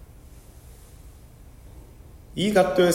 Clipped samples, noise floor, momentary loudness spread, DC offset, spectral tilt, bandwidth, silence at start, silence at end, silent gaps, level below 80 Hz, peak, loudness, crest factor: under 0.1%; -47 dBFS; 29 LU; under 0.1%; -5 dB/octave; 16 kHz; 0 s; 0 s; none; -48 dBFS; -6 dBFS; -22 LUFS; 22 dB